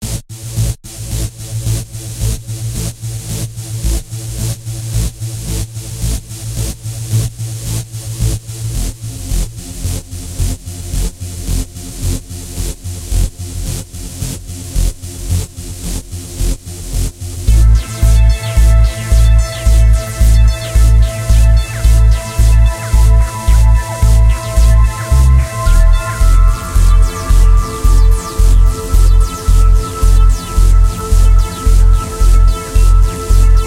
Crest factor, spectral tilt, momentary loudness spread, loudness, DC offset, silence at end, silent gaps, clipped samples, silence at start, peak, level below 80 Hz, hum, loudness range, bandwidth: 10 dB; -5 dB/octave; 12 LU; -15 LUFS; under 0.1%; 0 s; none; under 0.1%; 0 s; 0 dBFS; -12 dBFS; none; 10 LU; 15.5 kHz